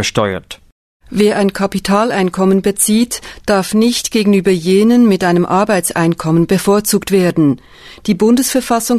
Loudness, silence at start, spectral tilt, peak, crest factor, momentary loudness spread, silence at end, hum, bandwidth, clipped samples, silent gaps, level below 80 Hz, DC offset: -13 LUFS; 0 s; -5 dB/octave; 0 dBFS; 12 dB; 8 LU; 0 s; none; 14 kHz; under 0.1%; 0.72-1.00 s; -44 dBFS; 0.2%